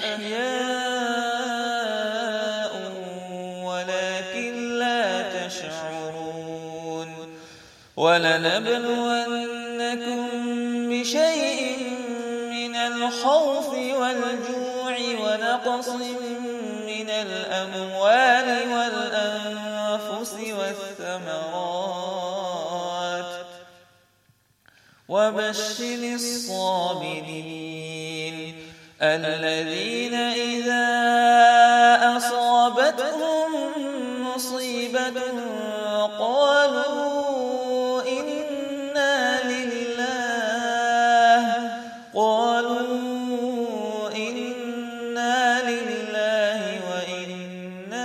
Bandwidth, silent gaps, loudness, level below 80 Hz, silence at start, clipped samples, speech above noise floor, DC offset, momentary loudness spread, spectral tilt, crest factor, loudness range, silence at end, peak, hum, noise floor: 15.5 kHz; none; -24 LUFS; -76 dBFS; 0 s; under 0.1%; 41 dB; under 0.1%; 13 LU; -3 dB/octave; 18 dB; 10 LU; 0 s; -6 dBFS; none; -63 dBFS